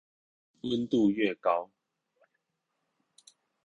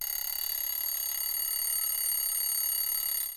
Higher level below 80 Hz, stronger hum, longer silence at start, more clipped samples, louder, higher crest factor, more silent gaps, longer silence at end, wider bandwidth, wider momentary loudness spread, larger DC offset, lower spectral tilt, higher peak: second, -70 dBFS vs -64 dBFS; neither; first, 0.65 s vs 0 s; neither; about the same, -29 LUFS vs -28 LUFS; first, 20 dB vs 10 dB; neither; first, 2 s vs 0 s; second, 11 kHz vs over 20 kHz; first, 12 LU vs 3 LU; neither; first, -6.5 dB/octave vs 3.5 dB/octave; first, -14 dBFS vs -20 dBFS